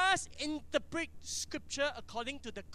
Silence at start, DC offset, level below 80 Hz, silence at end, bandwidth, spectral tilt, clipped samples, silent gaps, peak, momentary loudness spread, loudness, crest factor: 0 s; under 0.1%; -58 dBFS; 0 s; 15.5 kHz; -2 dB/octave; under 0.1%; none; -16 dBFS; 7 LU; -37 LUFS; 20 dB